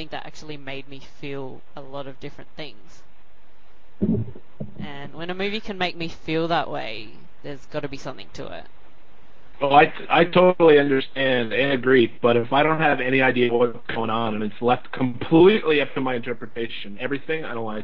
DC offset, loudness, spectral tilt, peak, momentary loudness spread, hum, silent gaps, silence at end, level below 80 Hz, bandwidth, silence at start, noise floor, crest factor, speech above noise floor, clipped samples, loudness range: 3%; -21 LUFS; -7 dB/octave; -2 dBFS; 22 LU; none; none; 0 s; -52 dBFS; 7.4 kHz; 0 s; -57 dBFS; 20 dB; 35 dB; under 0.1%; 14 LU